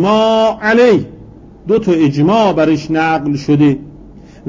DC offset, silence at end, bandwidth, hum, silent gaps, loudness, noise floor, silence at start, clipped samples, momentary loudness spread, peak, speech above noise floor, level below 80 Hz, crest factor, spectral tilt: under 0.1%; 0 s; 7.6 kHz; none; none; -12 LUFS; -36 dBFS; 0 s; under 0.1%; 6 LU; -2 dBFS; 25 dB; -42 dBFS; 12 dB; -7 dB/octave